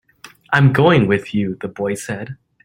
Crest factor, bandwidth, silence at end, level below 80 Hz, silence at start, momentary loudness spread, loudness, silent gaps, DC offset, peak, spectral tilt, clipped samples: 16 dB; 15 kHz; 0.3 s; -50 dBFS; 0.25 s; 15 LU; -17 LUFS; none; under 0.1%; 0 dBFS; -6.5 dB/octave; under 0.1%